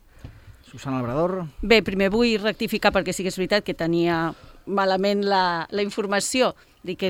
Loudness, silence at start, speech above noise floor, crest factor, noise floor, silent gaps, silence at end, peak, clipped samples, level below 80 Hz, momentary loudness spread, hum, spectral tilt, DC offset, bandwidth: -22 LUFS; 0.25 s; 22 dB; 20 dB; -44 dBFS; none; 0 s; -4 dBFS; under 0.1%; -46 dBFS; 11 LU; none; -4.5 dB/octave; under 0.1%; 17 kHz